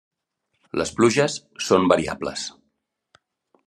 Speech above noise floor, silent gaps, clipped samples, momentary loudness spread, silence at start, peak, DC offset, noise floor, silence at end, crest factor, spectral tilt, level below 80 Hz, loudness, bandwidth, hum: 55 dB; none; under 0.1%; 13 LU; 0.75 s; -2 dBFS; under 0.1%; -76 dBFS; 1.15 s; 22 dB; -4.5 dB/octave; -58 dBFS; -22 LUFS; 12.5 kHz; none